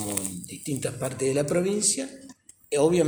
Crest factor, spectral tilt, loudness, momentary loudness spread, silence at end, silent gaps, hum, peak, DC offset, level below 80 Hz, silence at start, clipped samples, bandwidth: 22 dB; -4 dB/octave; -26 LUFS; 12 LU; 0 s; none; none; -4 dBFS; under 0.1%; -60 dBFS; 0 s; under 0.1%; over 20 kHz